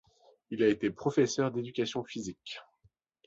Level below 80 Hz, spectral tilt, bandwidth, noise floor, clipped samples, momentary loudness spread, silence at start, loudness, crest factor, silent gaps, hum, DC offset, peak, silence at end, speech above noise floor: -68 dBFS; -5 dB/octave; 8 kHz; -70 dBFS; under 0.1%; 15 LU; 0.5 s; -31 LUFS; 20 dB; none; none; under 0.1%; -14 dBFS; 0.65 s; 39 dB